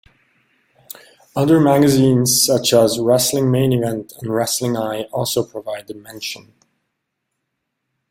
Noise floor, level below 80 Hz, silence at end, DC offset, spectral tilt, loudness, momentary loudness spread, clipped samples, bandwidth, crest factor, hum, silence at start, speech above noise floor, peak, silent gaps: -76 dBFS; -54 dBFS; 1.75 s; under 0.1%; -4.5 dB/octave; -16 LUFS; 18 LU; under 0.1%; 16.5 kHz; 18 dB; none; 1.35 s; 59 dB; -2 dBFS; none